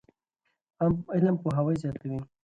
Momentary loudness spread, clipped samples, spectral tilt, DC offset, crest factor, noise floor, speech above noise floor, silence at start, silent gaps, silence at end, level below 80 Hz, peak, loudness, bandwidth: 9 LU; under 0.1%; -10 dB/octave; under 0.1%; 16 dB; -79 dBFS; 52 dB; 0.8 s; none; 0.2 s; -56 dBFS; -12 dBFS; -28 LUFS; 8.6 kHz